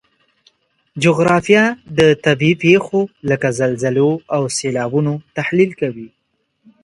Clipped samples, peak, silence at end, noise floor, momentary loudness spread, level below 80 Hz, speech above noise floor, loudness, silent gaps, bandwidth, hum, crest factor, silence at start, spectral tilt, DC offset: under 0.1%; 0 dBFS; 0.75 s; -68 dBFS; 8 LU; -54 dBFS; 53 dB; -16 LUFS; none; 11.5 kHz; none; 16 dB; 0.95 s; -5.5 dB/octave; under 0.1%